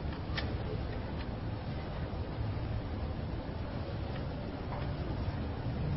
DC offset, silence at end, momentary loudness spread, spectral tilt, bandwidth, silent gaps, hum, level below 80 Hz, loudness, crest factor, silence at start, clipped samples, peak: under 0.1%; 0 s; 3 LU; -6.5 dB/octave; 5.8 kHz; none; none; -42 dBFS; -38 LUFS; 14 dB; 0 s; under 0.1%; -22 dBFS